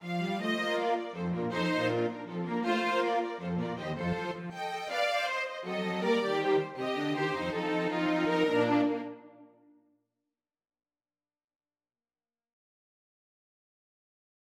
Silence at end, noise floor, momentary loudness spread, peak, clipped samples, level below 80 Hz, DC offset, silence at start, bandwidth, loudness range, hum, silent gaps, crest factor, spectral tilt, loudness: 5 s; under -90 dBFS; 7 LU; -14 dBFS; under 0.1%; -68 dBFS; under 0.1%; 0 s; 15 kHz; 3 LU; none; none; 18 dB; -6 dB/octave; -31 LUFS